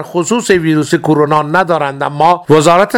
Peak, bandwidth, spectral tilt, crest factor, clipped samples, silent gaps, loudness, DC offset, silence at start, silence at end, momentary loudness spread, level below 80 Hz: 0 dBFS; 16.5 kHz; -5.5 dB/octave; 10 dB; 0.5%; none; -11 LUFS; under 0.1%; 0 s; 0 s; 6 LU; -48 dBFS